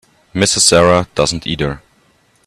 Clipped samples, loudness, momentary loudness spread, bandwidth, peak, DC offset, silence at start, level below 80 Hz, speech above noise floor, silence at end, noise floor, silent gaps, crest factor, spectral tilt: under 0.1%; -13 LUFS; 14 LU; 15 kHz; 0 dBFS; under 0.1%; 0.35 s; -40 dBFS; 41 dB; 0.7 s; -55 dBFS; none; 16 dB; -3 dB/octave